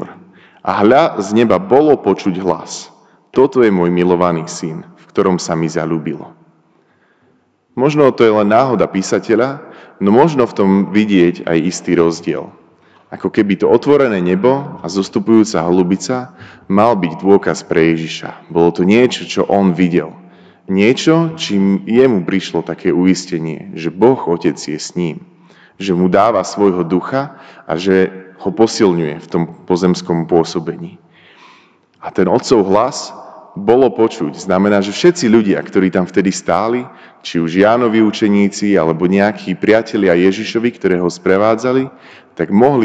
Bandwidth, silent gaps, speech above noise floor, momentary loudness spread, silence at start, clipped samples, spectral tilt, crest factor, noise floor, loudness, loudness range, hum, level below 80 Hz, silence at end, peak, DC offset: 9.2 kHz; none; 43 dB; 12 LU; 0 s; 0.3%; -6 dB/octave; 14 dB; -56 dBFS; -14 LUFS; 4 LU; none; -52 dBFS; 0 s; 0 dBFS; under 0.1%